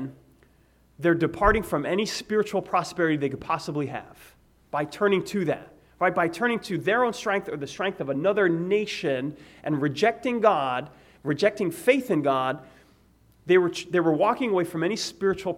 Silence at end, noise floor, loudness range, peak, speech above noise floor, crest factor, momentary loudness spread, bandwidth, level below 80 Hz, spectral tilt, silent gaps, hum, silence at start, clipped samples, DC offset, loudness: 0 s; -60 dBFS; 3 LU; -6 dBFS; 35 dB; 20 dB; 9 LU; 16 kHz; -48 dBFS; -5.5 dB/octave; none; none; 0 s; under 0.1%; under 0.1%; -25 LUFS